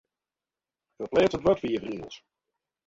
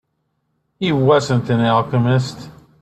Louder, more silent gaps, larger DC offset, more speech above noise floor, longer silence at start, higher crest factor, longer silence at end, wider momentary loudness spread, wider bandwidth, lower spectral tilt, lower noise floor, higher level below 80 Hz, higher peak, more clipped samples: second, -26 LUFS vs -17 LUFS; neither; neither; first, over 64 dB vs 54 dB; first, 1 s vs 0.8 s; about the same, 20 dB vs 16 dB; first, 0.7 s vs 0.3 s; first, 17 LU vs 10 LU; second, 7.8 kHz vs 8.8 kHz; about the same, -6 dB/octave vs -7 dB/octave; first, under -90 dBFS vs -70 dBFS; about the same, -56 dBFS vs -52 dBFS; second, -10 dBFS vs -2 dBFS; neither